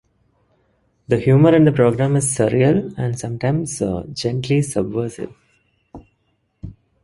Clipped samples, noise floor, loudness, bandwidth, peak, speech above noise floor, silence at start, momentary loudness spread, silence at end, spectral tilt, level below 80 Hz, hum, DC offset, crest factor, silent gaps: under 0.1%; -66 dBFS; -18 LUFS; 11.5 kHz; -2 dBFS; 50 dB; 1.1 s; 20 LU; 0.3 s; -6.5 dB/octave; -48 dBFS; none; under 0.1%; 18 dB; none